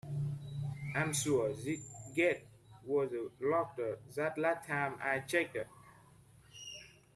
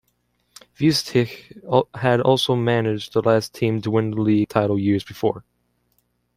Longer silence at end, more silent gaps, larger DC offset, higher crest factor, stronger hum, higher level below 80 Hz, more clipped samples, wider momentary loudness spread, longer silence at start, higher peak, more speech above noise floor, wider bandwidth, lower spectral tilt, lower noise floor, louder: second, 0.25 s vs 0.95 s; neither; neither; about the same, 20 dB vs 18 dB; second, none vs 60 Hz at -45 dBFS; second, -68 dBFS vs -58 dBFS; neither; first, 15 LU vs 7 LU; second, 0.05 s vs 0.8 s; second, -18 dBFS vs -2 dBFS; second, 27 dB vs 49 dB; second, 14 kHz vs 16 kHz; about the same, -5 dB/octave vs -6 dB/octave; second, -62 dBFS vs -68 dBFS; second, -36 LUFS vs -21 LUFS